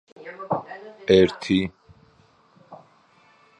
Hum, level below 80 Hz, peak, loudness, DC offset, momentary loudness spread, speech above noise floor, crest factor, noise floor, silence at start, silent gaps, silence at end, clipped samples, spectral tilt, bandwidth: none; -52 dBFS; -2 dBFS; -22 LUFS; under 0.1%; 22 LU; 36 dB; 22 dB; -58 dBFS; 0.25 s; none; 0.85 s; under 0.1%; -6.5 dB/octave; 9.6 kHz